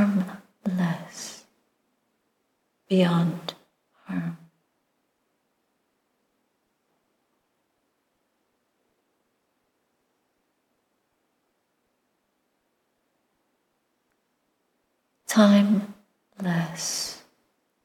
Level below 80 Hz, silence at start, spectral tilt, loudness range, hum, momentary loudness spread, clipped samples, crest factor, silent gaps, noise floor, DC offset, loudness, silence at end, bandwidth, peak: -76 dBFS; 0 s; -5.5 dB/octave; 16 LU; none; 20 LU; under 0.1%; 26 dB; none; -74 dBFS; under 0.1%; -25 LUFS; 0.65 s; 15.5 kHz; -4 dBFS